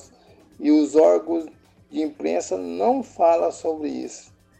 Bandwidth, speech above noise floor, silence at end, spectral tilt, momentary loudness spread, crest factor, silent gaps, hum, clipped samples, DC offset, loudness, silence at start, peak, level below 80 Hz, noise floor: 8.8 kHz; 32 dB; 0.4 s; -5 dB/octave; 16 LU; 16 dB; none; none; under 0.1%; under 0.1%; -21 LUFS; 0.6 s; -6 dBFS; -64 dBFS; -52 dBFS